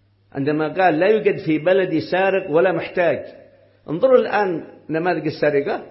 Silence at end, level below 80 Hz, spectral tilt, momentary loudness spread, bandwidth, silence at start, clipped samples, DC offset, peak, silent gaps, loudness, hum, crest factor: 0 s; -64 dBFS; -10.5 dB/octave; 11 LU; 5.8 kHz; 0.35 s; under 0.1%; under 0.1%; -2 dBFS; none; -19 LUFS; none; 18 dB